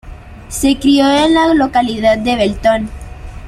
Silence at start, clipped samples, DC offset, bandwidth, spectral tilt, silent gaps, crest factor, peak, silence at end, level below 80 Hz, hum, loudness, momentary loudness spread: 0.05 s; under 0.1%; under 0.1%; 14.5 kHz; -4.5 dB/octave; none; 12 dB; -2 dBFS; 0 s; -32 dBFS; none; -12 LUFS; 15 LU